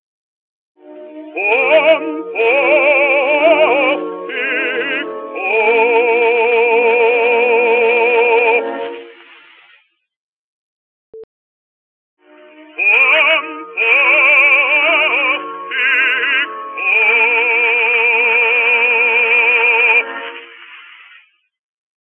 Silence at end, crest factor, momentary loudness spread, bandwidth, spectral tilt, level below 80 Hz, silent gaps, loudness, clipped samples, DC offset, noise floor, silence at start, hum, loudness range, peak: 1.35 s; 14 dB; 12 LU; 4.1 kHz; -4 dB/octave; -86 dBFS; 10.16-11.13 s, 11.24-12.17 s; -11 LUFS; under 0.1%; under 0.1%; -54 dBFS; 0.85 s; none; 5 LU; 0 dBFS